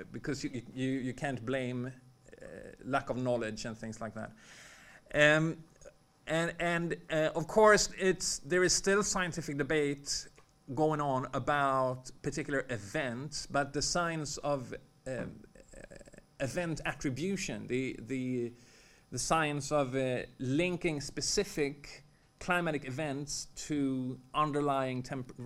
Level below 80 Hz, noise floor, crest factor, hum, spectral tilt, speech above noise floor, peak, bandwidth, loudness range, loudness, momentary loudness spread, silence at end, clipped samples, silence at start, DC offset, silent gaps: -56 dBFS; -58 dBFS; 26 dB; none; -4 dB/octave; 25 dB; -8 dBFS; 16 kHz; 9 LU; -33 LUFS; 16 LU; 0 s; under 0.1%; 0 s; under 0.1%; none